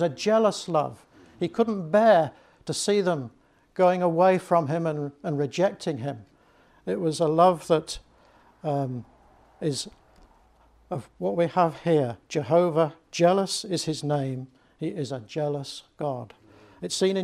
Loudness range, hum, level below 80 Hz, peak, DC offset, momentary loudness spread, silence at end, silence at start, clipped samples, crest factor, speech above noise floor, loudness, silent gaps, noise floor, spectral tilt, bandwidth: 8 LU; none; -62 dBFS; -6 dBFS; under 0.1%; 16 LU; 0 s; 0 s; under 0.1%; 20 dB; 34 dB; -25 LUFS; none; -59 dBFS; -5.5 dB/octave; 14.5 kHz